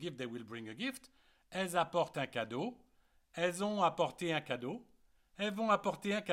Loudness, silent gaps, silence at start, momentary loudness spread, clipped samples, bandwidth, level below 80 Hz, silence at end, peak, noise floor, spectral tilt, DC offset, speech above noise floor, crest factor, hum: -37 LUFS; none; 0 s; 12 LU; under 0.1%; 16.5 kHz; -74 dBFS; 0 s; -18 dBFS; -69 dBFS; -4.5 dB/octave; under 0.1%; 33 dB; 20 dB; none